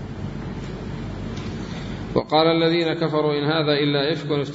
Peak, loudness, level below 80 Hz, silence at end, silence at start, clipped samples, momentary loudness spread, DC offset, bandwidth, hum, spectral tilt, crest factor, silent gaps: -2 dBFS; -23 LUFS; -42 dBFS; 0 s; 0 s; under 0.1%; 13 LU; under 0.1%; 7.8 kHz; none; -7 dB/octave; 20 dB; none